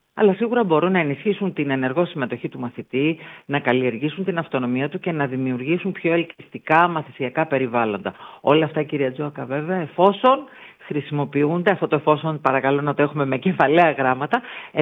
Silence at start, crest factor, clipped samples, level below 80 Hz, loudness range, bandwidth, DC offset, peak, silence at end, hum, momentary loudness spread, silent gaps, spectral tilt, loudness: 0.15 s; 18 dB; under 0.1%; -70 dBFS; 4 LU; 5.4 kHz; under 0.1%; -2 dBFS; 0 s; none; 10 LU; none; -9 dB/octave; -21 LUFS